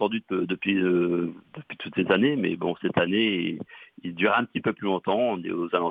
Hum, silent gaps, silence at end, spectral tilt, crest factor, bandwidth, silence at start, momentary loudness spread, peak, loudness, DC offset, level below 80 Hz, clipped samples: none; none; 0 s; -8.5 dB/octave; 18 dB; 4.8 kHz; 0 s; 15 LU; -6 dBFS; -25 LUFS; under 0.1%; -66 dBFS; under 0.1%